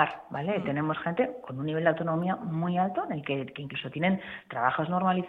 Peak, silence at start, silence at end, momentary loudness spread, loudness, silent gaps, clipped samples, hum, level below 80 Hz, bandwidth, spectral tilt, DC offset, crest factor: -8 dBFS; 0 s; 0 s; 8 LU; -30 LUFS; none; under 0.1%; none; -66 dBFS; 4.1 kHz; -9 dB/octave; under 0.1%; 22 dB